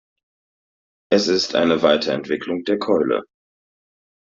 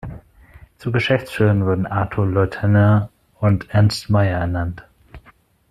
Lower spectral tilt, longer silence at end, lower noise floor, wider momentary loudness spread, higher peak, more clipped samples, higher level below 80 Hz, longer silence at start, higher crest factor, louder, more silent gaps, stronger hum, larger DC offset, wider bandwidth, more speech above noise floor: second, -3 dB/octave vs -7.5 dB/octave; first, 1.05 s vs 0.55 s; first, under -90 dBFS vs -53 dBFS; second, 7 LU vs 12 LU; about the same, -2 dBFS vs -4 dBFS; neither; second, -62 dBFS vs -44 dBFS; first, 1.1 s vs 0.05 s; about the same, 18 dB vs 16 dB; about the same, -19 LUFS vs -19 LUFS; neither; neither; neither; second, 7.8 kHz vs 11.5 kHz; first, over 71 dB vs 36 dB